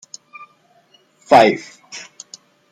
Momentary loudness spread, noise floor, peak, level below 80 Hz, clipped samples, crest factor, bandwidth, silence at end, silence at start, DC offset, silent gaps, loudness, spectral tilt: 26 LU; -55 dBFS; 0 dBFS; -64 dBFS; under 0.1%; 18 dB; 15 kHz; 0.75 s; 1.3 s; under 0.1%; none; -14 LUFS; -4 dB/octave